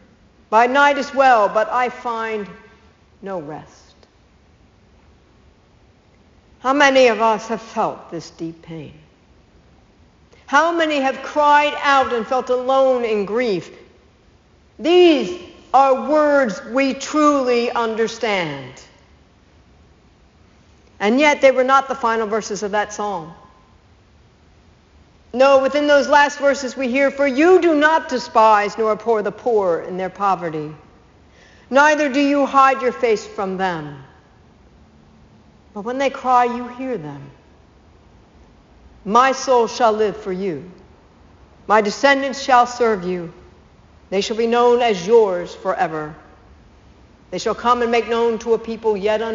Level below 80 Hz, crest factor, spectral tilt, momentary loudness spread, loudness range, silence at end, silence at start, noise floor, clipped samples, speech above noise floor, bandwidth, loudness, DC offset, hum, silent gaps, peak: -54 dBFS; 18 dB; -2.5 dB/octave; 16 LU; 9 LU; 0 s; 0.5 s; -53 dBFS; under 0.1%; 36 dB; 7.6 kHz; -17 LUFS; under 0.1%; none; none; 0 dBFS